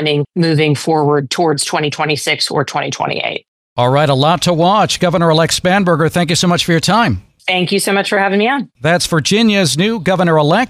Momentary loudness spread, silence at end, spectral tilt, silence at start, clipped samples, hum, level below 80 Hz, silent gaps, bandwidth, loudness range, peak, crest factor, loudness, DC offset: 5 LU; 0 s; -4.5 dB/octave; 0 s; under 0.1%; none; -46 dBFS; 3.48-3.76 s; 15.5 kHz; 3 LU; -2 dBFS; 12 dB; -13 LUFS; under 0.1%